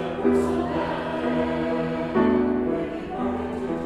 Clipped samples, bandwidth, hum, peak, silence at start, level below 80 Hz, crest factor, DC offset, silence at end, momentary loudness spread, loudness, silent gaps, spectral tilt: under 0.1%; 11 kHz; none; -8 dBFS; 0 s; -46 dBFS; 16 dB; under 0.1%; 0 s; 7 LU; -25 LUFS; none; -7.5 dB/octave